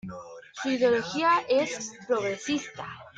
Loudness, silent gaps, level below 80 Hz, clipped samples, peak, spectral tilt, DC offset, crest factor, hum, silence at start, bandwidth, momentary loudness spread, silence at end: -27 LUFS; none; -68 dBFS; under 0.1%; -12 dBFS; -3.5 dB/octave; under 0.1%; 16 dB; none; 0.05 s; 9.2 kHz; 17 LU; 0.1 s